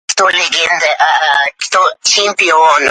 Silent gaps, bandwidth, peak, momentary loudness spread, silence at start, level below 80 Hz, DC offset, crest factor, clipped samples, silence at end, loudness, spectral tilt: none; 11.5 kHz; 0 dBFS; 4 LU; 0.1 s; -60 dBFS; under 0.1%; 12 dB; under 0.1%; 0 s; -10 LUFS; 1 dB/octave